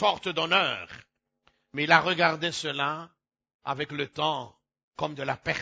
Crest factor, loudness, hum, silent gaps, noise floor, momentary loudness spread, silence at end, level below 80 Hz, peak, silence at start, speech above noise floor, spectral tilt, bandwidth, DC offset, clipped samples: 24 dB; -27 LUFS; none; 3.54-3.59 s, 4.83-4.91 s; -70 dBFS; 17 LU; 0 s; -64 dBFS; -4 dBFS; 0 s; 42 dB; -4 dB/octave; 8 kHz; under 0.1%; under 0.1%